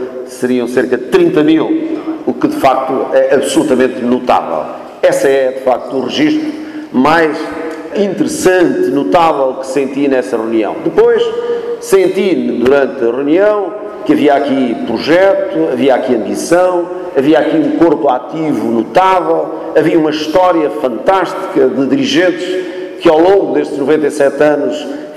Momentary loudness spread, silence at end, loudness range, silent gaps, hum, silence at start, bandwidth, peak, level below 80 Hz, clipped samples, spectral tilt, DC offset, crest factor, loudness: 8 LU; 0 s; 1 LU; none; none; 0 s; 13.5 kHz; 0 dBFS; -48 dBFS; under 0.1%; -5 dB/octave; under 0.1%; 10 dB; -12 LUFS